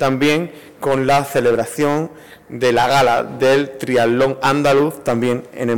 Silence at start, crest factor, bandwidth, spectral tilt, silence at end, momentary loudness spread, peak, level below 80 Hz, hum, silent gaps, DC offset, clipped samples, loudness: 0 s; 8 dB; 18 kHz; -5.5 dB/octave; 0 s; 8 LU; -8 dBFS; -48 dBFS; none; none; 0.7%; under 0.1%; -16 LUFS